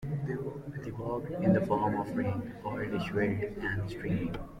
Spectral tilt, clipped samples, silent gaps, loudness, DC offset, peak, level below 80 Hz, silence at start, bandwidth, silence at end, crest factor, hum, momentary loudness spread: -8.5 dB/octave; under 0.1%; none; -33 LUFS; under 0.1%; -14 dBFS; -52 dBFS; 0 s; 14 kHz; 0 s; 18 dB; none; 10 LU